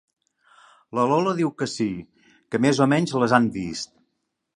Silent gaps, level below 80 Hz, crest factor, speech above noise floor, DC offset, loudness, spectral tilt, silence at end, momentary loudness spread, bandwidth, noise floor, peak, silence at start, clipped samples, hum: none; -60 dBFS; 22 dB; 55 dB; under 0.1%; -22 LUFS; -5.5 dB/octave; 0.7 s; 12 LU; 11.5 kHz; -77 dBFS; -2 dBFS; 0.95 s; under 0.1%; none